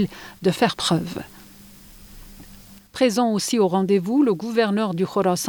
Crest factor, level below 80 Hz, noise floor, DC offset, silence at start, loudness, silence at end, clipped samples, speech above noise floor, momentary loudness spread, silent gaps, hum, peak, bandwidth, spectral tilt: 16 dB; -52 dBFS; -45 dBFS; under 0.1%; 0 s; -21 LUFS; 0 s; under 0.1%; 25 dB; 10 LU; none; none; -6 dBFS; over 20 kHz; -5 dB/octave